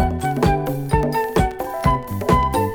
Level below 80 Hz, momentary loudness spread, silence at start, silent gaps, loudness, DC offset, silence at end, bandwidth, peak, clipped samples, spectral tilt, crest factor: -28 dBFS; 4 LU; 0 s; none; -20 LUFS; under 0.1%; 0 s; over 20 kHz; -4 dBFS; under 0.1%; -6.5 dB/octave; 16 dB